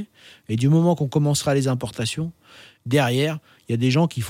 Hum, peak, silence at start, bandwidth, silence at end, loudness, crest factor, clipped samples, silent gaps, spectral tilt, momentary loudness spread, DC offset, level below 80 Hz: none; -6 dBFS; 0 s; 16 kHz; 0 s; -21 LUFS; 16 dB; under 0.1%; none; -6 dB/octave; 13 LU; under 0.1%; -60 dBFS